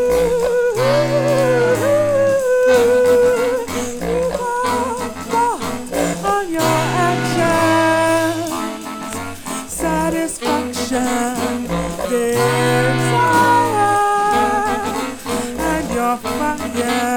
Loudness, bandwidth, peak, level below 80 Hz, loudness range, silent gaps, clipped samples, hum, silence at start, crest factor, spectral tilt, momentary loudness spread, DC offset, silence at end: -17 LUFS; 19.5 kHz; -2 dBFS; -40 dBFS; 5 LU; none; under 0.1%; none; 0 s; 14 dB; -4.5 dB/octave; 9 LU; under 0.1%; 0 s